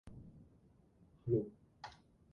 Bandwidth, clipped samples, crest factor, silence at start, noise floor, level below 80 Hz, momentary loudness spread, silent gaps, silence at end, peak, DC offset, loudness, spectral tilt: 7 kHz; under 0.1%; 22 dB; 0.05 s; -68 dBFS; -68 dBFS; 22 LU; none; 0.4 s; -22 dBFS; under 0.1%; -40 LUFS; -9 dB/octave